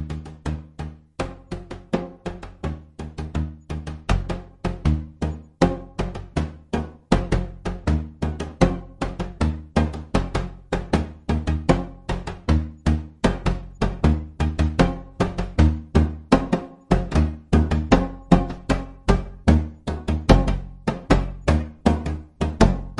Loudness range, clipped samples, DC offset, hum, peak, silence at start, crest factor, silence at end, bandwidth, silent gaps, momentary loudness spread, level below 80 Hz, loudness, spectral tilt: 7 LU; under 0.1%; under 0.1%; none; 0 dBFS; 0 s; 22 dB; 0 s; 11 kHz; none; 12 LU; -28 dBFS; -24 LUFS; -7 dB/octave